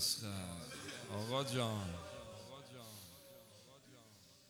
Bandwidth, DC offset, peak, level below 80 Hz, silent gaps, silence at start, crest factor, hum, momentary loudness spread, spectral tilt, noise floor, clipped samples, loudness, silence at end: over 20 kHz; under 0.1%; -24 dBFS; -74 dBFS; none; 0 s; 22 dB; none; 22 LU; -3.5 dB/octave; -64 dBFS; under 0.1%; -44 LUFS; 0 s